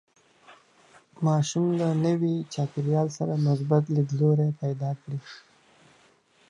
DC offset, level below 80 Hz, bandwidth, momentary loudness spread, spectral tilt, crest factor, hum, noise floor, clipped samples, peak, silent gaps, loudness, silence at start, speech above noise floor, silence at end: under 0.1%; -72 dBFS; 9.8 kHz; 9 LU; -7.5 dB/octave; 18 dB; none; -61 dBFS; under 0.1%; -8 dBFS; none; -26 LUFS; 0.5 s; 36 dB; 1.1 s